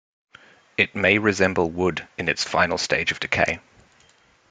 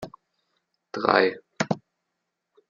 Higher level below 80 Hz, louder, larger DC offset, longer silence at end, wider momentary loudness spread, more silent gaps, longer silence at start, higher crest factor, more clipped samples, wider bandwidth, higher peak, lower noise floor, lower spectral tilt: first, -56 dBFS vs -70 dBFS; first, -22 LUFS vs -25 LUFS; neither; about the same, 0.9 s vs 0.9 s; second, 7 LU vs 16 LU; neither; first, 0.8 s vs 0 s; about the same, 22 dB vs 26 dB; neither; first, 9.6 kHz vs 7.4 kHz; about the same, -2 dBFS vs -2 dBFS; second, -58 dBFS vs -81 dBFS; about the same, -4 dB/octave vs -5 dB/octave